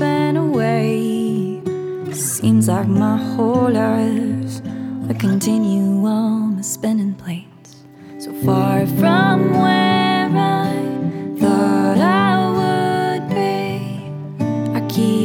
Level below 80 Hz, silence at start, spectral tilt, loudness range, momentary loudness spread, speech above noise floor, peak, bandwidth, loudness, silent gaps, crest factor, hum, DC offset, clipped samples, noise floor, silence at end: -64 dBFS; 0 s; -6 dB/octave; 3 LU; 10 LU; 26 dB; -2 dBFS; 18.5 kHz; -17 LUFS; none; 14 dB; none; under 0.1%; under 0.1%; -42 dBFS; 0 s